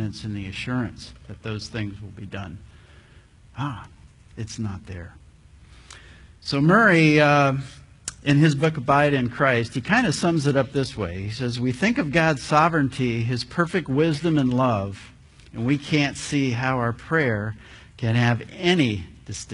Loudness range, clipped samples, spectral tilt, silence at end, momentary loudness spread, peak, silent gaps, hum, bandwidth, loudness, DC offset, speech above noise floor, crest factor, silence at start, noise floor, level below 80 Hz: 16 LU; under 0.1%; -6 dB/octave; 0 s; 18 LU; -4 dBFS; none; none; 11 kHz; -22 LUFS; under 0.1%; 29 dB; 20 dB; 0 s; -51 dBFS; -50 dBFS